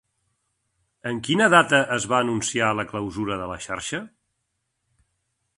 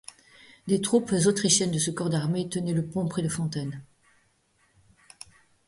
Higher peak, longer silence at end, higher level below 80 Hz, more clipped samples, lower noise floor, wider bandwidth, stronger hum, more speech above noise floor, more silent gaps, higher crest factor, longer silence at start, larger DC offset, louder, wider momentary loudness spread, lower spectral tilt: first, 0 dBFS vs -8 dBFS; second, 1.5 s vs 1.85 s; first, -56 dBFS vs -62 dBFS; neither; first, -77 dBFS vs -67 dBFS; about the same, 11.5 kHz vs 11.5 kHz; neither; first, 54 dB vs 41 dB; neither; about the same, 24 dB vs 20 dB; first, 1.05 s vs 0.65 s; neither; first, -22 LUFS vs -26 LUFS; second, 15 LU vs 25 LU; about the same, -3.5 dB/octave vs -4.5 dB/octave